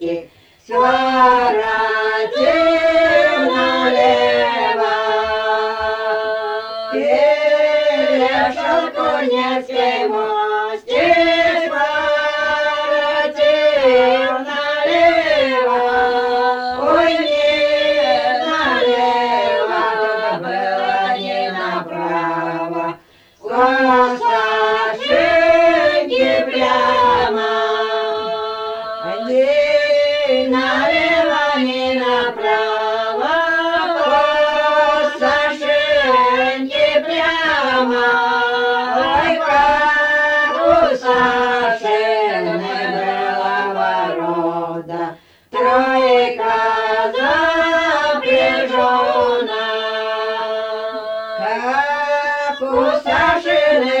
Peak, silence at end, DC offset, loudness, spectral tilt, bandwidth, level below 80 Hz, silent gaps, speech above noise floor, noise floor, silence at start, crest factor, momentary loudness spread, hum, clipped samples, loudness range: -2 dBFS; 0 s; under 0.1%; -15 LUFS; -4 dB/octave; 9 kHz; -50 dBFS; none; 31 dB; -46 dBFS; 0 s; 14 dB; 7 LU; none; under 0.1%; 4 LU